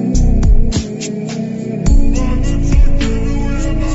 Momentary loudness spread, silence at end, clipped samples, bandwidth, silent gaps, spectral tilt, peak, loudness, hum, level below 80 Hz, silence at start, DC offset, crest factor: 7 LU; 0 s; under 0.1%; 8 kHz; none; -7.5 dB/octave; -2 dBFS; -17 LUFS; none; -12 dBFS; 0 s; under 0.1%; 10 dB